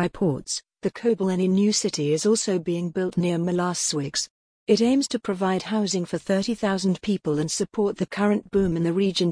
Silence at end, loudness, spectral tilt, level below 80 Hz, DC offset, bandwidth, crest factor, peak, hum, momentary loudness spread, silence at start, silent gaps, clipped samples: 0 s; -24 LUFS; -5 dB/octave; -56 dBFS; under 0.1%; 10.5 kHz; 18 dB; -6 dBFS; none; 6 LU; 0 s; 4.30-4.66 s; under 0.1%